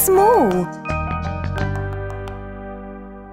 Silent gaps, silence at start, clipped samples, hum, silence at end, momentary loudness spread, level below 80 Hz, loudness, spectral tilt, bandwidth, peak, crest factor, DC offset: none; 0 s; under 0.1%; 50 Hz at -40 dBFS; 0 s; 20 LU; -34 dBFS; -20 LUFS; -6 dB/octave; 16 kHz; -2 dBFS; 18 dB; under 0.1%